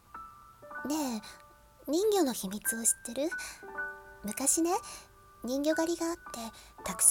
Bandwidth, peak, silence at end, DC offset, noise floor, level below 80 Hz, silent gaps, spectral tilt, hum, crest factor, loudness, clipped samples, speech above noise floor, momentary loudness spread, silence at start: 18 kHz; -10 dBFS; 0 s; under 0.1%; -51 dBFS; -62 dBFS; none; -2 dB/octave; none; 24 dB; -32 LUFS; under 0.1%; 20 dB; 18 LU; 0.15 s